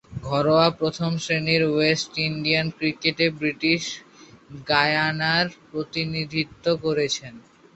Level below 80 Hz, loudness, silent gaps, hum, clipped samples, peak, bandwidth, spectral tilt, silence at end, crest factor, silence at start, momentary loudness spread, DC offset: -56 dBFS; -23 LUFS; none; none; under 0.1%; -4 dBFS; 8.2 kHz; -4.5 dB/octave; 0.35 s; 20 dB; 0.1 s; 8 LU; under 0.1%